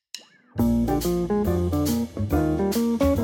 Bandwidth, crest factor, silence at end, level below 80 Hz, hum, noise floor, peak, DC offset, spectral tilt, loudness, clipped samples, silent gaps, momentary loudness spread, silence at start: 17 kHz; 14 dB; 0 s; -36 dBFS; none; -45 dBFS; -8 dBFS; under 0.1%; -7 dB/octave; -24 LUFS; under 0.1%; none; 6 LU; 0.15 s